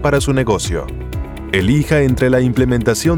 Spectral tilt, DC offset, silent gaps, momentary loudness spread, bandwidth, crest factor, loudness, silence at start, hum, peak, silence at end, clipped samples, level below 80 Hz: -6 dB/octave; under 0.1%; none; 12 LU; 19 kHz; 14 dB; -15 LUFS; 0 s; none; -2 dBFS; 0 s; under 0.1%; -28 dBFS